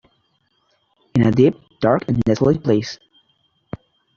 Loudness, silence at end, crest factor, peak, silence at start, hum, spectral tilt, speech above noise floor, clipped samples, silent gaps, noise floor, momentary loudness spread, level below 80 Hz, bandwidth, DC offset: -18 LUFS; 1.2 s; 20 dB; 0 dBFS; 1.15 s; none; -7.5 dB/octave; 49 dB; under 0.1%; none; -65 dBFS; 21 LU; -48 dBFS; 7.2 kHz; under 0.1%